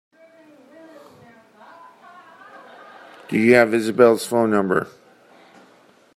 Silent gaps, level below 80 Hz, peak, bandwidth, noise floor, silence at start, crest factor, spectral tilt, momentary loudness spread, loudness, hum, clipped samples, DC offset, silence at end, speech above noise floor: none; -66 dBFS; -2 dBFS; 15 kHz; -54 dBFS; 3.3 s; 20 dB; -5.5 dB/octave; 12 LU; -17 LUFS; none; under 0.1%; under 0.1%; 1.3 s; 37 dB